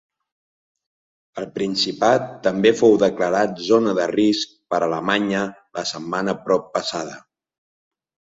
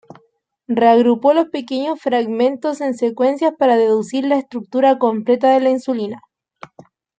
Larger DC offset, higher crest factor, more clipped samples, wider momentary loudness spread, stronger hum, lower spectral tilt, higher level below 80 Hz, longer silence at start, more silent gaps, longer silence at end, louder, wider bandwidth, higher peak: neither; about the same, 20 dB vs 16 dB; neither; first, 12 LU vs 9 LU; neither; second, -4.5 dB/octave vs -6 dB/octave; first, -62 dBFS vs -70 dBFS; first, 1.35 s vs 0.7 s; neither; about the same, 1.1 s vs 1 s; second, -20 LUFS vs -16 LUFS; second, 7.8 kHz vs 9.2 kHz; about the same, -2 dBFS vs -2 dBFS